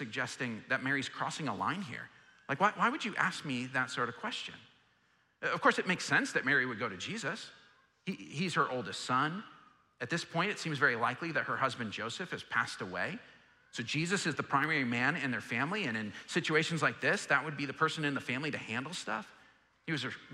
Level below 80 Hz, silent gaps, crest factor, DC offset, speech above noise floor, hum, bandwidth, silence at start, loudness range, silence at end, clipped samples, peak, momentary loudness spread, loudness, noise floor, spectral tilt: -78 dBFS; none; 22 dB; under 0.1%; 37 dB; none; 14 kHz; 0 s; 3 LU; 0 s; under 0.1%; -12 dBFS; 11 LU; -34 LUFS; -72 dBFS; -4 dB/octave